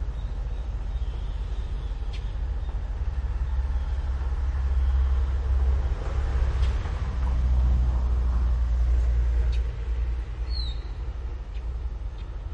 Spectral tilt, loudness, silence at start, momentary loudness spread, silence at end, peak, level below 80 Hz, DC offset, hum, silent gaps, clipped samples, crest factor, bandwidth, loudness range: -7 dB/octave; -29 LUFS; 0 s; 9 LU; 0 s; -14 dBFS; -26 dBFS; under 0.1%; none; none; under 0.1%; 12 dB; 6.2 kHz; 6 LU